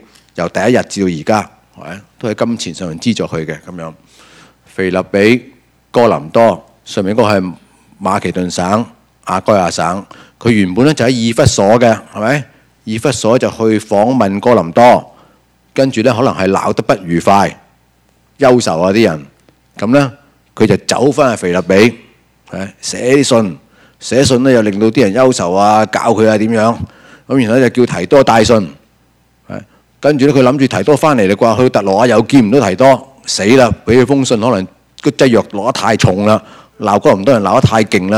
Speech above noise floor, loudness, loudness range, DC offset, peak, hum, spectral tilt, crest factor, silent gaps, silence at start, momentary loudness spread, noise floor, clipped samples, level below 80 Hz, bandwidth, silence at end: 42 dB; -11 LUFS; 5 LU; under 0.1%; 0 dBFS; none; -5.5 dB/octave; 12 dB; none; 0.35 s; 13 LU; -53 dBFS; 0.6%; -44 dBFS; 15.5 kHz; 0 s